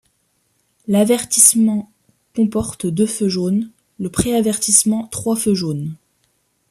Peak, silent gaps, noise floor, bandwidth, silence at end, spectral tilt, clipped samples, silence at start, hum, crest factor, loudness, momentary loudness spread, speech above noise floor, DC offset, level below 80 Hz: 0 dBFS; none; -65 dBFS; 14 kHz; 0.75 s; -4 dB/octave; under 0.1%; 0.9 s; none; 18 dB; -16 LUFS; 16 LU; 48 dB; under 0.1%; -48 dBFS